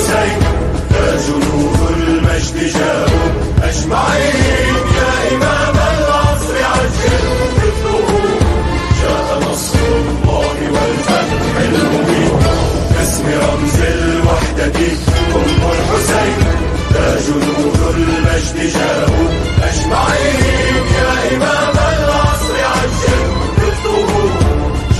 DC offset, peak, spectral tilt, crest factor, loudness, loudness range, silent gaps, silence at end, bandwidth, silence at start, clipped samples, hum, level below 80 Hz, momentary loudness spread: under 0.1%; 0 dBFS; -5 dB/octave; 12 dB; -13 LUFS; 1 LU; none; 0 s; 12.5 kHz; 0 s; under 0.1%; none; -20 dBFS; 2 LU